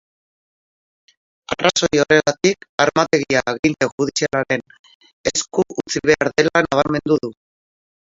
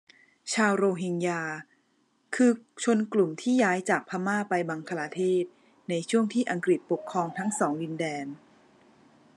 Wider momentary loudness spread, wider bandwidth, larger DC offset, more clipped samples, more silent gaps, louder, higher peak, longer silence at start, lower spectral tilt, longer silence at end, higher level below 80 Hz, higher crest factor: second, 7 LU vs 12 LU; second, 7.8 kHz vs 12 kHz; neither; neither; first, 2.69-2.78 s, 3.59-3.63 s, 3.92-3.98 s, 4.79-4.84 s, 4.95-5.01 s, 5.13-5.24 s vs none; first, -18 LUFS vs -28 LUFS; first, 0 dBFS vs -10 dBFS; first, 1.5 s vs 0.45 s; second, -3.5 dB/octave vs -5 dB/octave; second, 0.8 s vs 1 s; first, -52 dBFS vs -84 dBFS; about the same, 20 dB vs 18 dB